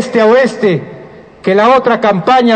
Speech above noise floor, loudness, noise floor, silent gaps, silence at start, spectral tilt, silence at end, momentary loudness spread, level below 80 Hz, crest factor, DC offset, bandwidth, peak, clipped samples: 25 dB; -10 LUFS; -33 dBFS; none; 0 s; -6 dB/octave; 0 s; 10 LU; -50 dBFS; 10 dB; under 0.1%; 9 kHz; 0 dBFS; under 0.1%